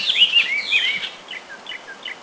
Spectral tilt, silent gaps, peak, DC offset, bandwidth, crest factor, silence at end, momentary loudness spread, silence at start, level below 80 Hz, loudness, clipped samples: 1 dB/octave; none; -4 dBFS; under 0.1%; 8 kHz; 18 dB; 0 s; 20 LU; 0 s; -68 dBFS; -16 LUFS; under 0.1%